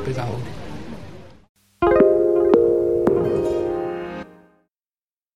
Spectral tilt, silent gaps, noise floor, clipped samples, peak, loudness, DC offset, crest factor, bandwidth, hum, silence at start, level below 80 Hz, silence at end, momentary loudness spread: -8.5 dB/octave; 1.49-1.55 s; under -90 dBFS; under 0.1%; -2 dBFS; -19 LUFS; under 0.1%; 20 dB; 9.6 kHz; none; 0 s; -44 dBFS; 1.05 s; 19 LU